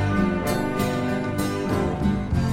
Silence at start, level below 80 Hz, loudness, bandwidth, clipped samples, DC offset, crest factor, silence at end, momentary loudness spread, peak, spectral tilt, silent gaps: 0 s; -36 dBFS; -24 LUFS; 17 kHz; under 0.1%; under 0.1%; 14 dB; 0 s; 3 LU; -8 dBFS; -6.5 dB/octave; none